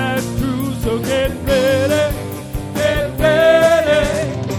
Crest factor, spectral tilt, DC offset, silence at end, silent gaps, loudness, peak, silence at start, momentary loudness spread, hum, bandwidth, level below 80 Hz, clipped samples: 16 dB; -5 dB/octave; under 0.1%; 0 s; none; -16 LUFS; 0 dBFS; 0 s; 9 LU; none; 16 kHz; -30 dBFS; under 0.1%